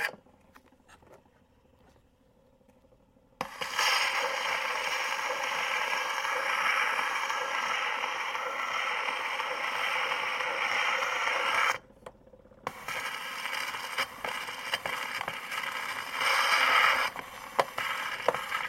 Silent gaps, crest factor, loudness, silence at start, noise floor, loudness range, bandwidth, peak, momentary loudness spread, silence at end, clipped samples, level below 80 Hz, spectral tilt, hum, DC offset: none; 24 dB; -29 LUFS; 0 s; -64 dBFS; 6 LU; 16.5 kHz; -8 dBFS; 10 LU; 0 s; under 0.1%; -70 dBFS; 0 dB/octave; none; under 0.1%